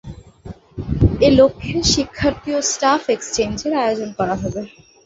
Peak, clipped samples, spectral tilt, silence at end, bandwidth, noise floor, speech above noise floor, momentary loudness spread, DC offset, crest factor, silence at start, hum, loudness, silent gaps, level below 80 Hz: -2 dBFS; under 0.1%; -4.5 dB/octave; 0.4 s; 8 kHz; -38 dBFS; 20 dB; 22 LU; under 0.1%; 16 dB; 0.05 s; none; -18 LUFS; none; -32 dBFS